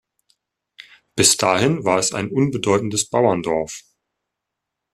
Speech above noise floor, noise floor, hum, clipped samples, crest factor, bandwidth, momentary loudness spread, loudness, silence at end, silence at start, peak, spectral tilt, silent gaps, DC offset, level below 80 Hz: 63 dB; -82 dBFS; none; under 0.1%; 22 dB; 14.5 kHz; 10 LU; -18 LUFS; 1.15 s; 0.8 s; 0 dBFS; -3.5 dB/octave; none; under 0.1%; -56 dBFS